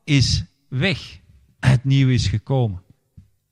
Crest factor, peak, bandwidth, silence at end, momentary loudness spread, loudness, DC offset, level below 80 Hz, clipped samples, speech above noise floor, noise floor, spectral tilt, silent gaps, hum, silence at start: 18 dB; -2 dBFS; 10 kHz; 0.7 s; 12 LU; -20 LUFS; under 0.1%; -38 dBFS; under 0.1%; 33 dB; -51 dBFS; -5.5 dB/octave; none; none; 0.05 s